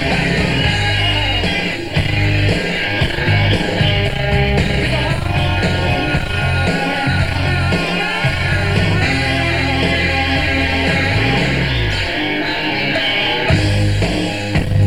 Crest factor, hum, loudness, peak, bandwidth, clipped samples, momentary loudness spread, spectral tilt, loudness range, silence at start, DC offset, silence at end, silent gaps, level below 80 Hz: 16 dB; none; -16 LUFS; 0 dBFS; 15.5 kHz; under 0.1%; 3 LU; -5.5 dB/octave; 1 LU; 0 s; 2%; 0 s; none; -26 dBFS